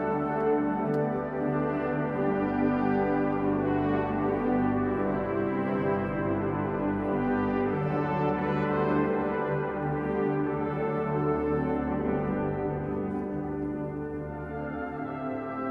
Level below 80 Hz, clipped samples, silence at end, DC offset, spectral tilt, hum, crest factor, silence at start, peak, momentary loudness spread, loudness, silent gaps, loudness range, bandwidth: -50 dBFS; under 0.1%; 0 s; under 0.1%; -10 dB/octave; none; 14 dB; 0 s; -14 dBFS; 7 LU; -29 LUFS; none; 4 LU; 5.2 kHz